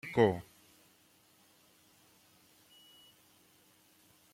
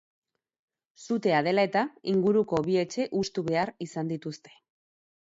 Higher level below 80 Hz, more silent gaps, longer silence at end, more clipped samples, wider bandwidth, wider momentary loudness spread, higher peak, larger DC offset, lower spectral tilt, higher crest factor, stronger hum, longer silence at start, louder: second, -72 dBFS vs -66 dBFS; neither; first, 3.9 s vs 0.9 s; neither; first, 16.5 kHz vs 8 kHz; first, 31 LU vs 10 LU; about the same, -14 dBFS vs -12 dBFS; neither; about the same, -6.5 dB/octave vs -6 dB/octave; first, 26 dB vs 18 dB; neither; second, 0.05 s vs 1 s; second, -31 LUFS vs -27 LUFS